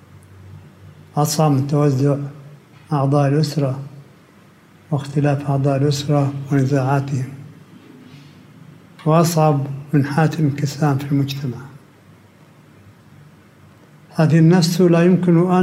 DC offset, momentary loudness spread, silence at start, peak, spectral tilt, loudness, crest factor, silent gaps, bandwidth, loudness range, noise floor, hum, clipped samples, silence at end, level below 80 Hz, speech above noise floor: under 0.1%; 12 LU; 0.45 s; -4 dBFS; -7 dB/octave; -18 LUFS; 16 dB; none; 15.5 kHz; 4 LU; -48 dBFS; none; under 0.1%; 0 s; -62 dBFS; 32 dB